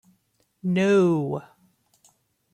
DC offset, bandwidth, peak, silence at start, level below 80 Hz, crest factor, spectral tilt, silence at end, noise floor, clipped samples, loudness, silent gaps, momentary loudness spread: under 0.1%; 10 kHz; -10 dBFS; 0.65 s; -68 dBFS; 16 dB; -7.5 dB/octave; 1.1 s; -69 dBFS; under 0.1%; -23 LUFS; none; 14 LU